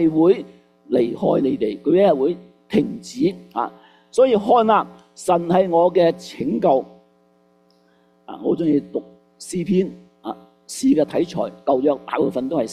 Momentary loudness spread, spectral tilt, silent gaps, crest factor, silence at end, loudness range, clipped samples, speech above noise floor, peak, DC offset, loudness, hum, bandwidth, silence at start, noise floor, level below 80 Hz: 17 LU; -6.5 dB/octave; none; 16 dB; 0 s; 7 LU; under 0.1%; 39 dB; -4 dBFS; under 0.1%; -20 LUFS; none; 13.5 kHz; 0 s; -58 dBFS; -60 dBFS